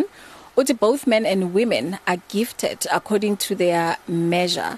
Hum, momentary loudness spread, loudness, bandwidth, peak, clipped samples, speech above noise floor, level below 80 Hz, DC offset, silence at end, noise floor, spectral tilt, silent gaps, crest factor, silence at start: none; 5 LU; -21 LUFS; 13.5 kHz; -6 dBFS; under 0.1%; 24 dB; -62 dBFS; under 0.1%; 0 s; -44 dBFS; -4.5 dB/octave; none; 14 dB; 0 s